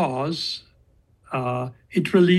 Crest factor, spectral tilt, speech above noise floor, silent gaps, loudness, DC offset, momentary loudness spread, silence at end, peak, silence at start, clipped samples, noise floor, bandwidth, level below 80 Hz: 18 dB; -6.5 dB/octave; 37 dB; none; -25 LUFS; under 0.1%; 10 LU; 0 s; -6 dBFS; 0 s; under 0.1%; -59 dBFS; 12.5 kHz; -60 dBFS